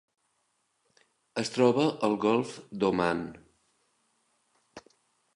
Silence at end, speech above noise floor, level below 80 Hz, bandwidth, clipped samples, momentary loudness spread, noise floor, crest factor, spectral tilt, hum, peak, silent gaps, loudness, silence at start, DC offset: 0.55 s; 48 dB; -66 dBFS; 11.5 kHz; under 0.1%; 13 LU; -75 dBFS; 22 dB; -5.5 dB/octave; none; -10 dBFS; none; -28 LUFS; 1.35 s; under 0.1%